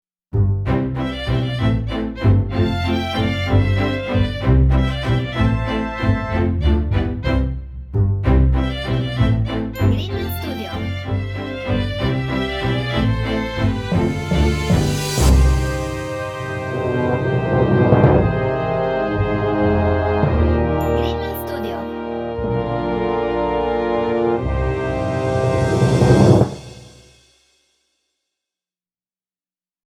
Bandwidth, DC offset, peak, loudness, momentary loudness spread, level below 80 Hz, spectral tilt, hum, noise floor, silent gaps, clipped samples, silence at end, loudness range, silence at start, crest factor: 16.5 kHz; under 0.1%; 0 dBFS; -19 LUFS; 9 LU; -26 dBFS; -7 dB/octave; none; under -90 dBFS; none; under 0.1%; 3 s; 4 LU; 0.35 s; 18 dB